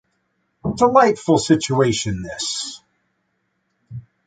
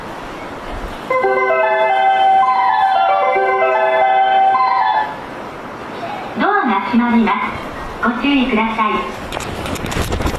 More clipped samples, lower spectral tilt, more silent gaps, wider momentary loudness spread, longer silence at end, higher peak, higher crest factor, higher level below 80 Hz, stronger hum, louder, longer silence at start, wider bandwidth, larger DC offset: neither; about the same, -5 dB/octave vs -5 dB/octave; neither; first, 24 LU vs 15 LU; first, 0.25 s vs 0 s; about the same, -2 dBFS vs -4 dBFS; first, 18 dB vs 12 dB; second, -48 dBFS vs -36 dBFS; neither; second, -18 LUFS vs -15 LUFS; first, 0.65 s vs 0 s; second, 9.4 kHz vs 14 kHz; neither